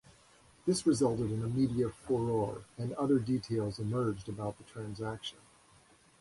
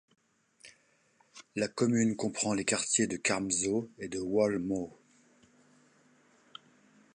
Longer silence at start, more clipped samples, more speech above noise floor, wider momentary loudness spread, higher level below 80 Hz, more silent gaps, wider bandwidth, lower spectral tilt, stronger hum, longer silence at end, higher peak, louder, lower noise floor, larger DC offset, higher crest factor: about the same, 0.65 s vs 0.65 s; neither; second, 30 dB vs 38 dB; second, 11 LU vs 17 LU; first, -60 dBFS vs -66 dBFS; neither; about the same, 11.5 kHz vs 11 kHz; first, -6.5 dB/octave vs -3.5 dB/octave; neither; second, 0.9 s vs 2.25 s; about the same, -16 dBFS vs -16 dBFS; second, -34 LUFS vs -31 LUFS; second, -63 dBFS vs -69 dBFS; neither; about the same, 18 dB vs 18 dB